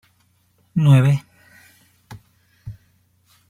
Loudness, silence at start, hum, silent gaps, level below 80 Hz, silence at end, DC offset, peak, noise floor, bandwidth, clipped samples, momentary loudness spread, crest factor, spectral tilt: -17 LUFS; 0.75 s; none; none; -56 dBFS; 0.75 s; under 0.1%; -4 dBFS; -62 dBFS; 12 kHz; under 0.1%; 26 LU; 18 dB; -8 dB/octave